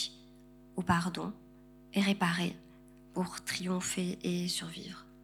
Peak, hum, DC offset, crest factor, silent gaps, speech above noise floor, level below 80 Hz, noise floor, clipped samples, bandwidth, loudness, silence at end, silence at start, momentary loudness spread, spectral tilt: -14 dBFS; 50 Hz at -60 dBFS; under 0.1%; 22 dB; none; 23 dB; -64 dBFS; -57 dBFS; under 0.1%; 16 kHz; -34 LUFS; 0 s; 0 s; 13 LU; -4.5 dB/octave